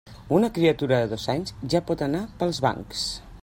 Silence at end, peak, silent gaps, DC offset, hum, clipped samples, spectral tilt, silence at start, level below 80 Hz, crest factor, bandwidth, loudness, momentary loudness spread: 0 s; -8 dBFS; none; under 0.1%; none; under 0.1%; -5.5 dB/octave; 0.05 s; -48 dBFS; 18 dB; 16.5 kHz; -25 LUFS; 8 LU